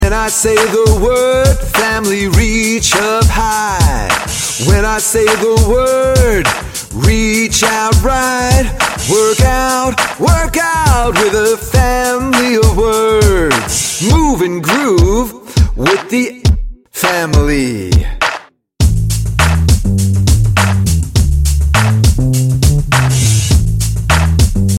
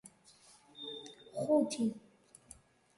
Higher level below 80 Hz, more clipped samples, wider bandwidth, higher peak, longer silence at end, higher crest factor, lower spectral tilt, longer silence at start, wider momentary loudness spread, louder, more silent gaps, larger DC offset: first, -16 dBFS vs -76 dBFS; neither; first, 16.5 kHz vs 11.5 kHz; first, 0 dBFS vs -18 dBFS; second, 0 s vs 1 s; second, 10 dB vs 20 dB; about the same, -4.5 dB/octave vs -5 dB/octave; about the same, 0 s vs 0.05 s; second, 4 LU vs 26 LU; first, -12 LUFS vs -36 LUFS; neither; neither